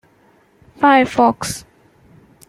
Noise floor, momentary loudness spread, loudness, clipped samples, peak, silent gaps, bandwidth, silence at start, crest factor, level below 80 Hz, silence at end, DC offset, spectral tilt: -54 dBFS; 14 LU; -15 LUFS; under 0.1%; -2 dBFS; none; 15.5 kHz; 0.8 s; 16 dB; -52 dBFS; 0.9 s; under 0.1%; -4 dB/octave